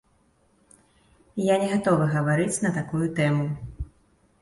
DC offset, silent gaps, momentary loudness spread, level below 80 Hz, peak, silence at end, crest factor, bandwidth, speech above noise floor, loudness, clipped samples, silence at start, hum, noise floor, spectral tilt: under 0.1%; none; 15 LU; -48 dBFS; -8 dBFS; 0.55 s; 18 dB; 11.5 kHz; 41 dB; -24 LUFS; under 0.1%; 1.35 s; none; -64 dBFS; -6 dB/octave